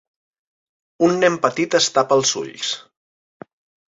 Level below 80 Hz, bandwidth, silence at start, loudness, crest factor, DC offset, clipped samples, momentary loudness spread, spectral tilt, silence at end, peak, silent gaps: -66 dBFS; 8 kHz; 1 s; -18 LUFS; 20 dB; under 0.1%; under 0.1%; 9 LU; -3 dB/octave; 1.15 s; -2 dBFS; none